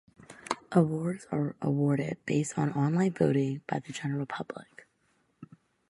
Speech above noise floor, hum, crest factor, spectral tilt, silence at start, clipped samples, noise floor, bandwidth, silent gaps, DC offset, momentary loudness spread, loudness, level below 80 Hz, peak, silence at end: 43 dB; none; 22 dB; -7 dB/octave; 0.3 s; under 0.1%; -72 dBFS; 11.5 kHz; none; under 0.1%; 11 LU; -30 LUFS; -68 dBFS; -8 dBFS; 0.45 s